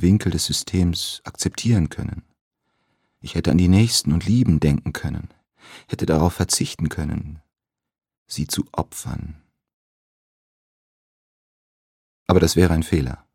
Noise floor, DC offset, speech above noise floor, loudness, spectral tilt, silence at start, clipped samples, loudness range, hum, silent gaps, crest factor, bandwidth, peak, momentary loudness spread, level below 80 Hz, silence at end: -70 dBFS; under 0.1%; 50 dB; -21 LUFS; -5.5 dB/octave; 0 s; under 0.1%; 11 LU; none; 2.41-2.51 s, 8.18-8.26 s, 9.74-12.26 s; 22 dB; 17 kHz; 0 dBFS; 16 LU; -38 dBFS; 0.2 s